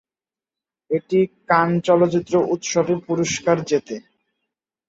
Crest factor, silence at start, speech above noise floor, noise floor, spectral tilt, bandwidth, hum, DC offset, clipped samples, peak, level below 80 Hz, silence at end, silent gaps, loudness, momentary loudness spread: 18 dB; 0.9 s; over 71 dB; under -90 dBFS; -5 dB/octave; 8 kHz; none; under 0.1%; under 0.1%; -2 dBFS; -60 dBFS; 0.9 s; none; -20 LUFS; 8 LU